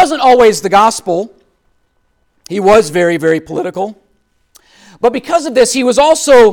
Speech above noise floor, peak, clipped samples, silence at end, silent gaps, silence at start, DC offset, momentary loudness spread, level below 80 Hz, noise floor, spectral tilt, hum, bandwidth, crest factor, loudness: 49 dB; 0 dBFS; under 0.1%; 0 s; none; 0 s; under 0.1%; 12 LU; -44 dBFS; -59 dBFS; -3.5 dB/octave; none; 17.5 kHz; 10 dB; -11 LUFS